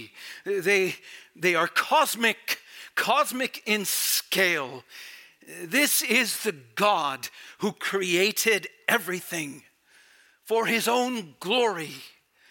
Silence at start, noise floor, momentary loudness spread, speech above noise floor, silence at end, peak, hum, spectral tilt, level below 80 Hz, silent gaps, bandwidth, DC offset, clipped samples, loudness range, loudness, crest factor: 0 s; -59 dBFS; 16 LU; 33 dB; 0.45 s; -6 dBFS; none; -2 dB/octave; -82 dBFS; none; 17 kHz; under 0.1%; under 0.1%; 3 LU; -25 LUFS; 20 dB